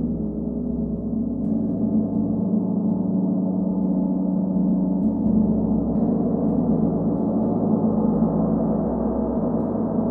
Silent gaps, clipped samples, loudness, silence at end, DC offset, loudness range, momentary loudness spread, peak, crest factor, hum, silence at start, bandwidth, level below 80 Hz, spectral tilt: none; under 0.1%; -22 LUFS; 0 s; under 0.1%; 2 LU; 5 LU; -8 dBFS; 14 dB; none; 0 s; 1.8 kHz; -40 dBFS; -14.5 dB/octave